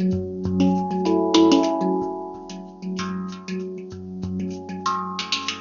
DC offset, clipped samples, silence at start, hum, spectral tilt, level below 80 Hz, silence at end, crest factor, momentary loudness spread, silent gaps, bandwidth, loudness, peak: under 0.1%; under 0.1%; 0 s; none; -5 dB/octave; -54 dBFS; 0 s; 20 dB; 17 LU; none; 7.4 kHz; -23 LUFS; -4 dBFS